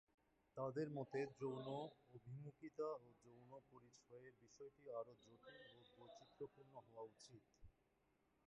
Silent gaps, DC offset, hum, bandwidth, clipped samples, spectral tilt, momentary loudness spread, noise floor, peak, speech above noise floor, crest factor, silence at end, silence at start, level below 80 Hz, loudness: none; under 0.1%; none; 8.2 kHz; under 0.1%; -6.5 dB/octave; 18 LU; -83 dBFS; -36 dBFS; 29 dB; 20 dB; 0.75 s; 0.55 s; -84 dBFS; -53 LUFS